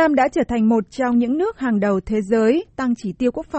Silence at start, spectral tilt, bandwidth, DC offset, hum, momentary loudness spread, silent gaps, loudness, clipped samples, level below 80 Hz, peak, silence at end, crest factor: 0 s; -7 dB/octave; 8.4 kHz; under 0.1%; none; 6 LU; none; -19 LUFS; under 0.1%; -46 dBFS; -4 dBFS; 0 s; 14 dB